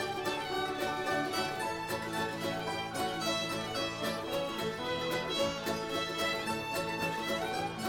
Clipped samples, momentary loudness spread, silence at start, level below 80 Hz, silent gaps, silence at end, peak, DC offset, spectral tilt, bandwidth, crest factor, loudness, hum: under 0.1%; 3 LU; 0 s; -62 dBFS; none; 0 s; -20 dBFS; under 0.1%; -3.5 dB/octave; 18 kHz; 14 dB; -34 LUFS; none